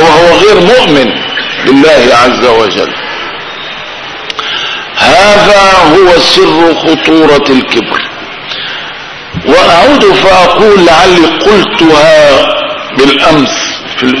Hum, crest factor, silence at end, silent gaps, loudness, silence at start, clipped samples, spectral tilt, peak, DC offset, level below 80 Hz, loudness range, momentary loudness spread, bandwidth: none; 6 dB; 0 s; none; -5 LUFS; 0 s; 9%; -4 dB/octave; 0 dBFS; under 0.1%; -32 dBFS; 4 LU; 14 LU; 11 kHz